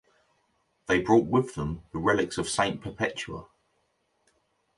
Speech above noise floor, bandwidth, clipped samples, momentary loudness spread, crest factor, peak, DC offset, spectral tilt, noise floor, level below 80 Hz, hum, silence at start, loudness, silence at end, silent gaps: 46 dB; 11.5 kHz; under 0.1%; 15 LU; 22 dB; -8 dBFS; under 0.1%; -5 dB/octave; -73 dBFS; -52 dBFS; none; 0.9 s; -27 LUFS; 1.35 s; none